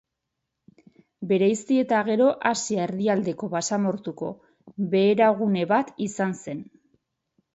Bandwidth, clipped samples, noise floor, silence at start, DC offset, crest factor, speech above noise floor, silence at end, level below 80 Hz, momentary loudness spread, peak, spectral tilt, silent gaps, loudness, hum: 8.2 kHz; under 0.1%; -82 dBFS; 1.2 s; under 0.1%; 20 dB; 59 dB; 0.9 s; -70 dBFS; 14 LU; -6 dBFS; -5.5 dB/octave; none; -24 LUFS; none